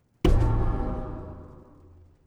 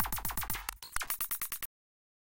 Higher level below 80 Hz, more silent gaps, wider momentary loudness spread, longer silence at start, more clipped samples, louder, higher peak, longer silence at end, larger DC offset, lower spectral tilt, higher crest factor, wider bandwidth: first, -28 dBFS vs -50 dBFS; neither; first, 20 LU vs 6 LU; first, 0.25 s vs 0 s; neither; first, -27 LUFS vs -36 LUFS; first, -10 dBFS vs -16 dBFS; first, 0.75 s vs 0.55 s; neither; first, -8 dB/octave vs -1 dB/octave; about the same, 18 dB vs 22 dB; second, 9.2 kHz vs 17 kHz